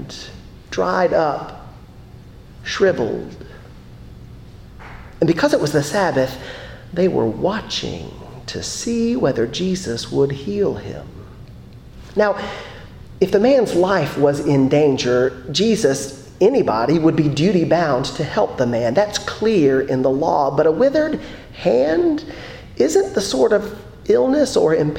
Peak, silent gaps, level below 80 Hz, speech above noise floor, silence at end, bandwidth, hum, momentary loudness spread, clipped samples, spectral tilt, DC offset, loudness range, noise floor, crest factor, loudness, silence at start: -2 dBFS; none; -44 dBFS; 22 dB; 0 s; 16.5 kHz; none; 18 LU; under 0.1%; -5.5 dB/octave; under 0.1%; 6 LU; -40 dBFS; 16 dB; -18 LUFS; 0 s